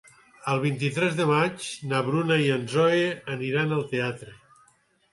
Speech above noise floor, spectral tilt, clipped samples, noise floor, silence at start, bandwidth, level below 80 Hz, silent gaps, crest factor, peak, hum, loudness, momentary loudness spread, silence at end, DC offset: 38 dB; -6 dB/octave; under 0.1%; -63 dBFS; 0.45 s; 11.5 kHz; -66 dBFS; none; 18 dB; -8 dBFS; none; -25 LUFS; 9 LU; 0.8 s; under 0.1%